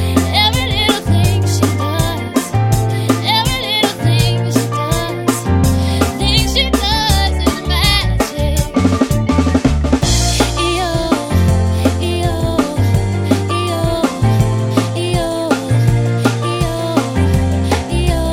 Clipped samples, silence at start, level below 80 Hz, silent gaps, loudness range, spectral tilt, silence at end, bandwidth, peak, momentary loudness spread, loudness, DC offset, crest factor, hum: under 0.1%; 0 s; -24 dBFS; none; 2 LU; -5 dB/octave; 0 s; 16.5 kHz; 0 dBFS; 4 LU; -15 LUFS; under 0.1%; 14 dB; none